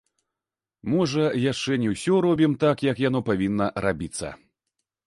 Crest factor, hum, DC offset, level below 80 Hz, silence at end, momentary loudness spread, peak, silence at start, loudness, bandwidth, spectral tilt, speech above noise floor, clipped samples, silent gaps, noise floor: 16 dB; none; under 0.1%; -52 dBFS; 0.7 s; 10 LU; -8 dBFS; 0.85 s; -24 LUFS; 11.5 kHz; -6 dB/octave; 66 dB; under 0.1%; none; -89 dBFS